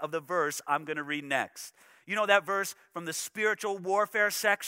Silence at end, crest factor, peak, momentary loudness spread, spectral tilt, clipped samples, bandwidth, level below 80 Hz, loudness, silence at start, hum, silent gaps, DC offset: 0 s; 24 dB; -8 dBFS; 11 LU; -2.5 dB/octave; under 0.1%; 16 kHz; -86 dBFS; -30 LUFS; 0 s; none; none; under 0.1%